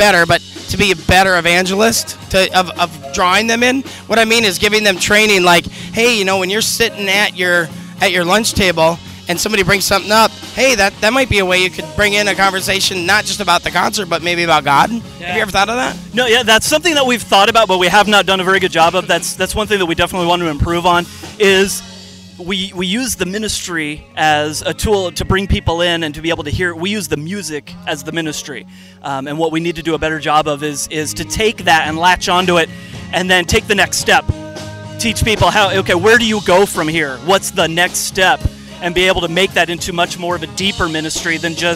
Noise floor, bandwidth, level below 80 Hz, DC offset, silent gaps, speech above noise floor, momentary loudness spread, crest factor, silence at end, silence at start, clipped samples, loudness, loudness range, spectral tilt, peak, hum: -35 dBFS; 16 kHz; -34 dBFS; under 0.1%; none; 21 dB; 10 LU; 14 dB; 0 s; 0 s; under 0.1%; -13 LUFS; 6 LU; -3 dB/octave; 0 dBFS; none